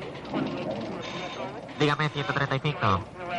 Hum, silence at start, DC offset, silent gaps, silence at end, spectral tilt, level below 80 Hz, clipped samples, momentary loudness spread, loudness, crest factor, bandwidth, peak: none; 0 s; under 0.1%; none; 0 s; -6 dB/octave; -56 dBFS; under 0.1%; 9 LU; -29 LUFS; 16 dB; 9.8 kHz; -14 dBFS